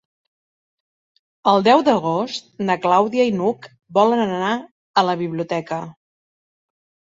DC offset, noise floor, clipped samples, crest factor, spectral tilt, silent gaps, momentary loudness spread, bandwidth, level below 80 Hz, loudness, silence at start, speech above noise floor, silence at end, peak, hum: under 0.1%; under -90 dBFS; under 0.1%; 18 dB; -6 dB/octave; 4.71-4.94 s; 12 LU; 7.8 kHz; -66 dBFS; -19 LUFS; 1.45 s; over 72 dB; 1.2 s; -2 dBFS; none